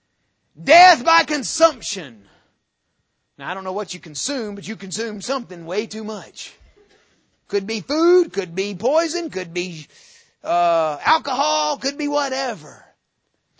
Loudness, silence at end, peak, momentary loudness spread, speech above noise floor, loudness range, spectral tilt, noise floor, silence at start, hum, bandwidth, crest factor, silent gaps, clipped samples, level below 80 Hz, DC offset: -19 LUFS; 0.85 s; 0 dBFS; 16 LU; 52 dB; 11 LU; -3 dB/octave; -72 dBFS; 0.6 s; none; 8 kHz; 22 dB; none; under 0.1%; -62 dBFS; under 0.1%